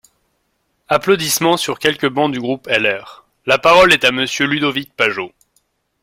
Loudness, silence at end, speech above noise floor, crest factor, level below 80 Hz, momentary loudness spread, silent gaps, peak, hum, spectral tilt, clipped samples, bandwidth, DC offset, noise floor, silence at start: -15 LUFS; 0.75 s; 51 dB; 16 dB; -52 dBFS; 11 LU; none; 0 dBFS; none; -3 dB/octave; under 0.1%; 16.5 kHz; under 0.1%; -67 dBFS; 0.9 s